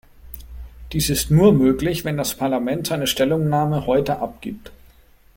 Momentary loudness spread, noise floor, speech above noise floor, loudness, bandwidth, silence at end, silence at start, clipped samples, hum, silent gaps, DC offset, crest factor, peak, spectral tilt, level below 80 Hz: 24 LU; -51 dBFS; 32 dB; -19 LUFS; 17 kHz; 0.6 s; 0.25 s; under 0.1%; none; none; under 0.1%; 18 dB; -2 dBFS; -5.5 dB/octave; -40 dBFS